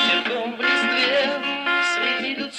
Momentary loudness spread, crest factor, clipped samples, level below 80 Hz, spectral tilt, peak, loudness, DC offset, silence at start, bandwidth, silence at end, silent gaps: 5 LU; 12 dB; under 0.1%; -70 dBFS; -2 dB/octave; -8 dBFS; -20 LUFS; under 0.1%; 0 s; 12 kHz; 0 s; none